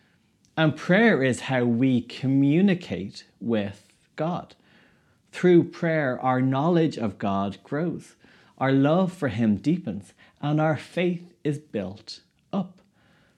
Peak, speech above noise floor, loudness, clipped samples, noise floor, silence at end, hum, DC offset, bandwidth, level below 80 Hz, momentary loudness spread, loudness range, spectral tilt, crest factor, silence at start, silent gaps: -6 dBFS; 40 dB; -24 LUFS; under 0.1%; -64 dBFS; 0.7 s; none; under 0.1%; 11 kHz; -68 dBFS; 16 LU; 5 LU; -7.5 dB/octave; 18 dB; 0.55 s; none